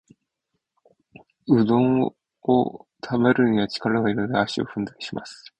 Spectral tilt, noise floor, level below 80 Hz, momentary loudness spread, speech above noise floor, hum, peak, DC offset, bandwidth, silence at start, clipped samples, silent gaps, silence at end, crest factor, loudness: -7 dB/octave; -79 dBFS; -58 dBFS; 14 LU; 57 dB; none; -6 dBFS; under 0.1%; 9 kHz; 1.45 s; under 0.1%; none; 0.25 s; 18 dB; -22 LUFS